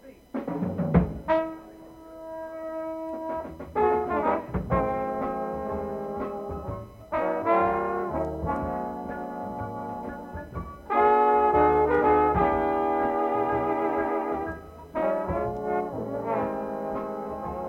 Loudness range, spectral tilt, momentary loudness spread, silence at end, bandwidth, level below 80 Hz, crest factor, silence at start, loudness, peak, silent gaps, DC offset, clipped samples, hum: 7 LU; -9 dB/octave; 16 LU; 0 s; 16 kHz; -44 dBFS; 20 dB; 0.05 s; -27 LUFS; -8 dBFS; none; under 0.1%; under 0.1%; none